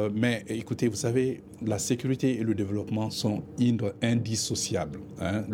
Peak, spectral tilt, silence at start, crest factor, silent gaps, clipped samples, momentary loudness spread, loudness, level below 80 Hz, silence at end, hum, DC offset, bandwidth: -10 dBFS; -5 dB/octave; 0 s; 18 dB; none; under 0.1%; 6 LU; -29 LUFS; -58 dBFS; 0 s; none; under 0.1%; 17 kHz